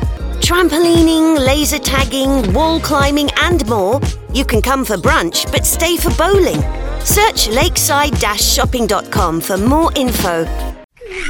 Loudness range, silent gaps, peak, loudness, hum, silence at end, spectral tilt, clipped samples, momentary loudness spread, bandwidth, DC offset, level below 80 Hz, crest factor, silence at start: 2 LU; 10.84-10.89 s; 0 dBFS; -13 LUFS; none; 0 s; -4 dB/octave; under 0.1%; 7 LU; 18 kHz; under 0.1%; -22 dBFS; 14 dB; 0 s